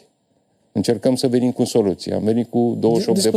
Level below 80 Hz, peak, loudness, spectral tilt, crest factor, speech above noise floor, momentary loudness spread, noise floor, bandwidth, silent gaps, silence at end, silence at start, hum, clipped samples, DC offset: -62 dBFS; -6 dBFS; -19 LUFS; -6 dB/octave; 14 dB; 46 dB; 4 LU; -64 dBFS; 15.5 kHz; none; 0 s; 0.75 s; none; under 0.1%; under 0.1%